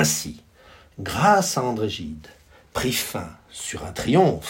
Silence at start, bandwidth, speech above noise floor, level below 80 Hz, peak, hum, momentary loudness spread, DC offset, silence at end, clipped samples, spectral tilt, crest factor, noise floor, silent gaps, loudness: 0 s; 16.5 kHz; 28 dB; -50 dBFS; -2 dBFS; none; 17 LU; under 0.1%; 0 s; under 0.1%; -4 dB/octave; 22 dB; -51 dBFS; none; -23 LUFS